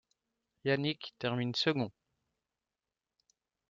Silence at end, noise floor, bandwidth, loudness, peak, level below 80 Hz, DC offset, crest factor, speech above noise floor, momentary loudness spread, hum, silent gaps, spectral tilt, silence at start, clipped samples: 1.8 s; under -90 dBFS; 7.6 kHz; -34 LUFS; -16 dBFS; -76 dBFS; under 0.1%; 22 dB; over 56 dB; 7 LU; none; none; -4 dB/octave; 0.65 s; under 0.1%